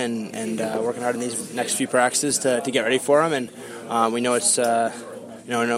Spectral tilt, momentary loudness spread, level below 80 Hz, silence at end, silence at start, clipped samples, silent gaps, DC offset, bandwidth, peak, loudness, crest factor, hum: -2.5 dB/octave; 10 LU; -72 dBFS; 0 s; 0 s; under 0.1%; none; under 0.1%; 16 kHz; -4 dBFS; -22 LUFS; 18 dB; none